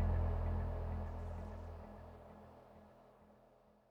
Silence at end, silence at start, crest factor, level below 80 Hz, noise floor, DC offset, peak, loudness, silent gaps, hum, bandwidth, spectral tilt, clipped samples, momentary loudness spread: 0.55 s; 0 s; 16 dB; -46 dBFS; -68 dBFS; under 0.1%; -26 dBFS; -44 LUFS; none; none; 4.7 kHz; -9.5 dB/octave; under 0.1%; 24 LU